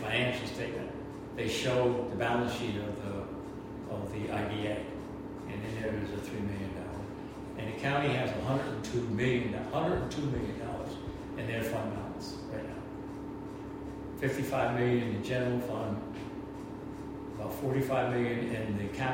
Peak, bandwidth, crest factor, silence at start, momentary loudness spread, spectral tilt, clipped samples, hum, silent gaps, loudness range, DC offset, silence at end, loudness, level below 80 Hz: -16 dBFS; 16 kHz; 18 dB; 0 s; 12 LU; -6 dB/octave; under 0.1%; none; none; 5 LU; under 0.1%; 0 s; -35 LUFS; -52 dBFS